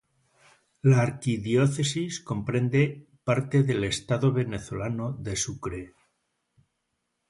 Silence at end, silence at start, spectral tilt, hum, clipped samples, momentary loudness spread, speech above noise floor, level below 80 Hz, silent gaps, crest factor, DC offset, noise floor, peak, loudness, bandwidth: 1.4 s; 0.85 s; -6 dB/octave; none; under 0.1%; 9 LU; 53 dB; -54 dBFS; none; 18 dB; under 0.1%; -79 dBFS; -8 dBFS; -27 LUFS; 11.5 kHz